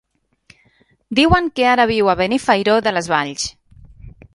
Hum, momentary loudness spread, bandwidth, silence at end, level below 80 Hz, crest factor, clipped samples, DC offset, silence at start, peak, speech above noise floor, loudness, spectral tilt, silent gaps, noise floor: none; 8 LU; 11.5 kHz; 0.25 s; -38 dBFS; 18 dB; under 0.1%; under 0.1%; 1.1 s; 0 dBFS; 42 dB; -16 LUFS; -4.5 dB/octave; none; -57 dBFS